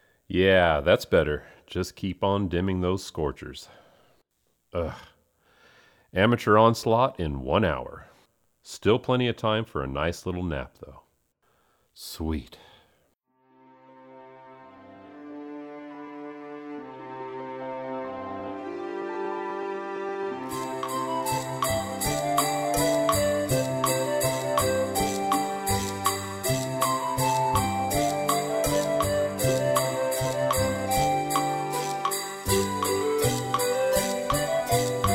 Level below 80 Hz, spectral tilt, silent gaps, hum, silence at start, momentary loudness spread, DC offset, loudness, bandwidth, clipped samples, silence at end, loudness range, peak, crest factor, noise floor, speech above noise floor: -46 dBFS; -4.5 dB/octave; none; none; 0.3 s; 16 LU; under 0.1%; -26 LUFS; 18 kHz; under 0.1%; 0 s; 15 LU; -6 dBFS; 22 dB; -72 dBFS; 47 dB